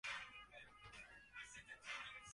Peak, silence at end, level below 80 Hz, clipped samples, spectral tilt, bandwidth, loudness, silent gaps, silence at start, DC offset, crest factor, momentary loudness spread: -36 dBFS; 0 s; -76 dBFS; under 0.1%; -0.5 dB/octave; 11.5 kHz; -54 LUFS; none; 0.05 s; under 0.1%; 18 dB; 9 LU